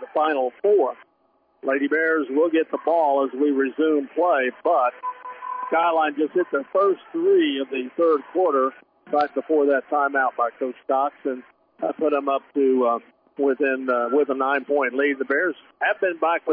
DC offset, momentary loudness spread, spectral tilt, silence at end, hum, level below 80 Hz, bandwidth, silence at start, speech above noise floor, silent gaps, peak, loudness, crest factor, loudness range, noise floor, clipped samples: under 0.1%; 7 LU; -7.5 dB/octave; 0 s; none; -82 dBFS; 5.2 kHz; 0 s; 43 dB; none; -10 dBFS; -22 LUFS; 12 dB; 2 LU; -64 dBFS; under 0.1%